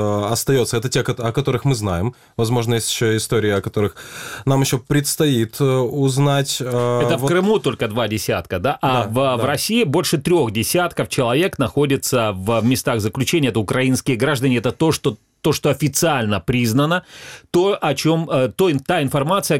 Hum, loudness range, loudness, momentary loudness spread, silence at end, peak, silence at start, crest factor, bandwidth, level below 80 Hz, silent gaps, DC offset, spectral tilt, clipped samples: none; 2 LU; -18 LUFS; 4 LU; 0 s; -4 dBFS; 0 s; 14 dB; 17 kHz; -48 dBFS; none; 0.2%; -5 dB/octave; under 0.1%